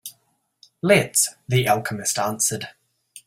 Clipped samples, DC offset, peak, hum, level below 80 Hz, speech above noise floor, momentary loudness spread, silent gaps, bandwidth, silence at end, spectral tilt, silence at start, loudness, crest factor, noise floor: under 0.1%; under 0.1%; -2 dBFS; none; -60 dBFS; 46 dB; 14 LU; none; 16.5 kHz; 0.05 s; -3.5 dB/octave; 0.05 s; -20 LUFS; 22 dB; -67 dBFS